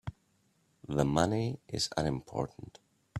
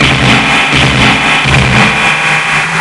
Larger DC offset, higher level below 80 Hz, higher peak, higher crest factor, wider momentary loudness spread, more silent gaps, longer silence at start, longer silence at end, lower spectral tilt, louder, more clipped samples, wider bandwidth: neither; second, -54 dBFS vs -26 dBFS; second, -10 dBFS vs 0 dBFS; first, 24 dB vs 8 dB; first, 22 LU vs 2 LU; neither; about the same, 0.05 s vs 0 s; about the same, 0 s vs 0 s; first, -5.5 dB/octave vs -4 dB/octave; second, -33 LUFS vs -6 LUFS; second, under 0.1% vs 0.5%; first, 14.5 kHz vs 11.5 kHz